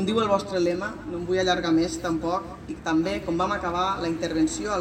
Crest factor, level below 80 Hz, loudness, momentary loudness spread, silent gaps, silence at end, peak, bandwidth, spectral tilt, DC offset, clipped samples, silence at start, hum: 18 dB; -46 dBFS; -25 LUFS; 8 LU; none; 0 s; -8 dBFS; 10 kHz; -5 dB/octave; under 0.1%; under 0.1%; 0 s; none